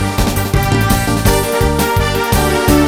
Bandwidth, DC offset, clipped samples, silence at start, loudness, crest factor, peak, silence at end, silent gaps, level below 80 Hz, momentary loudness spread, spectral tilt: 17 kHz; under 0.1%; under 0.1%; 0 s; -14 LUFS; 12 dB; 0 dBFS; 0 s; none; -20 dBFS; 2 LU; -5 dB/octave